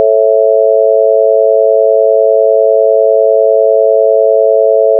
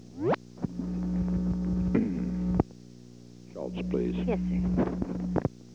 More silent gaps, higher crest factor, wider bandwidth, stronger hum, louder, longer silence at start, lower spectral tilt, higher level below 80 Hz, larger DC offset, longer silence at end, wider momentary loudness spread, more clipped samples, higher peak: neither; second, 8 dB vs 24 dB; second, 0.8 kHz vs 7.2 kHz; second, none vs 60 Hz at -40 dBFS; first, -8 LUFS vs -30 LUFS; about the same, 0 s vs 0 s; second, -4.5 dB/octave vs -9 dB/octave; second, under -90 dBFS vs -42 dBFS; second, under 0.1% vs 0.1%; about the same, 0 s vs 0 s; second, 0 LU vs 16 LU; neither; first, 0 dBFS vs -6 dBFS